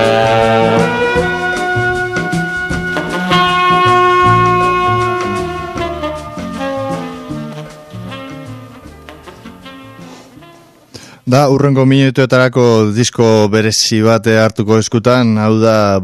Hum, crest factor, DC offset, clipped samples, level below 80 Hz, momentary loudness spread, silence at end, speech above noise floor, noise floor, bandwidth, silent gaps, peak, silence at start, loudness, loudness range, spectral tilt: none; 12 dB; under 0.1%; under 0.1%; -38 dBFS; 17 LU; 0 s; 31 dB; -41 dBFS; 14 kHz; none; 0 dBFS; 0 s; -12 LUFS; 18 LU; -5.5 dB/octave